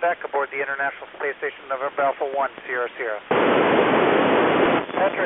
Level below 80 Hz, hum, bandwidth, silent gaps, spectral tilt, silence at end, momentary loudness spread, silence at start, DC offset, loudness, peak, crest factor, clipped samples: -60 dBFS; none; 4 kHz; none; -9.5 dB/octave; 0 s; 10 LU; 0 s; under 0.1%; -22 LUFS; -6 dBFS; 16 dB; under 0.1%